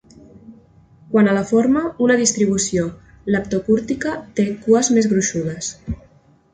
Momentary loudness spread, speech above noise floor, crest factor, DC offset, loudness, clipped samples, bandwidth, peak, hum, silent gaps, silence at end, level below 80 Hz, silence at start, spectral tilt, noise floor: 12 LU; 35 dB; 16 dB; under 0.1%; -18 LUFS; under 0.1%; 9.6 kHz; -2 dBFS; none; none; 0.6 s; -46 dBFS; 0.5 s; -4.5 dB/octave; -52 dBFS